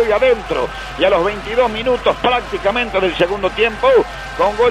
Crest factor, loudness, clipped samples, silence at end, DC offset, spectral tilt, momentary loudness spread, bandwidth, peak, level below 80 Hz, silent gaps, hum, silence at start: 14 dB; -16 LUFS; under 0.1%; 0 s; under 0.1%; -4.5 dB/octave; 5 LU; 12 kHz; -2 dBFS; -36 dBFS; none; none; 0 s